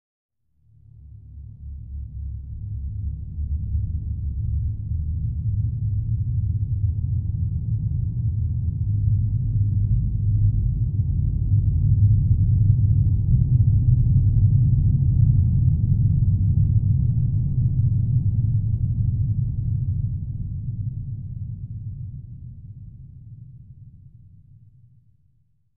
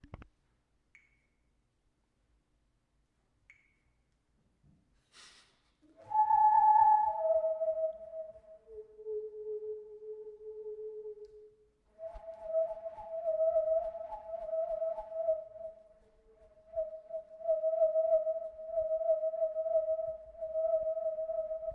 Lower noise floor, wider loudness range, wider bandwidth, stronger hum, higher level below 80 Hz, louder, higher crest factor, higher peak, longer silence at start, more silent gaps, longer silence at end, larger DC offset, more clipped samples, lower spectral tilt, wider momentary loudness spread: second, -64 dBFS vs -77 dBFS; about the same, 15 LU vs 15 LU; second, 0.8 kHz vs 6 kHz; neither; first, -28 dBFS vs -66 dBFS; first, -22 LUFS vs -33 LUFS; about the same, 16 dB vs 18 dB; first, -4 dBFS vs -16 dBFS; first, 0.95 s vs 0.15 s; neither; first, 1.7 s vs 0 s; first, 0.1% vs under 0.1%; neither; first, -18.5 dB/octave vs -5.5 dB/octave; second, 16 LU vs 21 LU